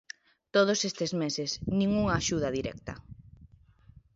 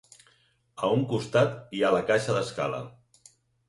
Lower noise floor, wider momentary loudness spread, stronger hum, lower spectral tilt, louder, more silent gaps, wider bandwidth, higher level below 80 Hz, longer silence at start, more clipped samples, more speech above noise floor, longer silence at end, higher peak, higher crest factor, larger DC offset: second, -58 dBFS vs -66 dBFS; first, 18 LU vs 7 LU; neither; about the same, -4.5 dB/octave vs -5.5 dB/octave; about the same, -29 LUFS vs -27 LUFS; neither; second, 7.8 kHz vs 11.5 kHz; first, -52 dBFS vs -64 dBFS; second, 0.55 s vs 0.75 s; neither; second, 29 dB vs 40 dB; about the same, 0.7 s vs 0.8 s; about the same, -12 dBFS vs -10 dBFS; about the same, 20 dB vs 20 dB; neither